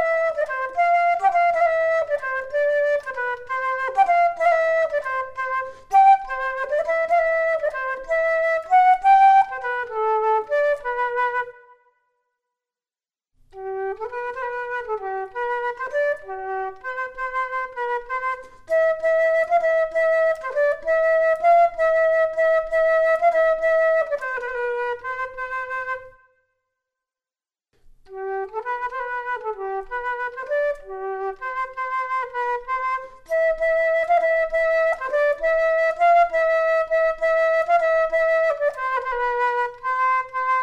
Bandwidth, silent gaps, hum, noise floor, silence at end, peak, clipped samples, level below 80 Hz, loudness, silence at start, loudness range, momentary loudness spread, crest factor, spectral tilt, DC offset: 8.4 kHz; none; none; under -90 dBFS; 0 s; -6 dBFS; under 0.1%; -52 dBFS; -21 LUFS; 0 s; 11 LU; 11 LU; 14 dB; -3 dB/octave; under 0.1%